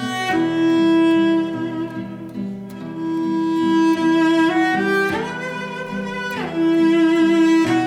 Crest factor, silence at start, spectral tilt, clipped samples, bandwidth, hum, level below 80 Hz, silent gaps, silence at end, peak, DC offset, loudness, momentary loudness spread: 10 dB; 0 s; -6 dB/octave; under 0.1%; 10 kHz; none; -58 dBFS; none; 0 s; -8 dBFS; under 0.1%; -18 LUFS; 13 LU